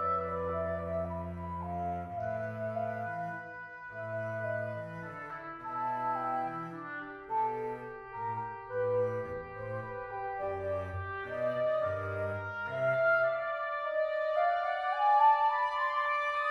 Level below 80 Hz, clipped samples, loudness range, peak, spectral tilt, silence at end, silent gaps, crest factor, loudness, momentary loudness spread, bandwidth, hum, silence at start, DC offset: -66 dBFS; under 0.1%; 9 LU; -16 dBFS; -7 dB/octave; 0 s; none; 18 dB; -33 LUFS; 13 LU; 10 kHz; none; 0 s; under 0.1%